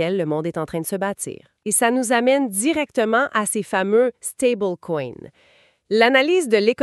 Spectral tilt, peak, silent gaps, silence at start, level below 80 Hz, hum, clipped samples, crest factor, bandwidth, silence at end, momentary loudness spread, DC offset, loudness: -3.5 dB/octave; -2 dBFS; none; 0 s; -64 dBFS; none; under 0.1%; 18 dB; 14 kHz; 0 s; 10 LU; under 0.1%; -20 LUFS